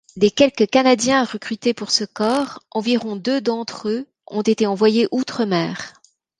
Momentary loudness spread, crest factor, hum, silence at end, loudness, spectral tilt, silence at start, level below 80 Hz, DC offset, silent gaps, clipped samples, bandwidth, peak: 10 LU; 18 dB; none; 0.5 s; -19 LUFS; -4 dB/octave; 0.15 s; -62 dBFS; under 0.1%; none; under 0.1%; 11.5 kHz; -2 dBFS